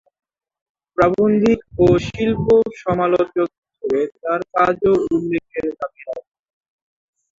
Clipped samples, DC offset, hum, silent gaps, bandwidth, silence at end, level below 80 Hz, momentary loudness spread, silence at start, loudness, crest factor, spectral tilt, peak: under 0.1%; under 0.1%; none; 3.58-3.62 s; 7.6 kHz; 1.2 s; -44 dBFS; 13 LU; 1 s; -18 LUFS; 18 dB; -7.5 dB/octave; -2 dBFS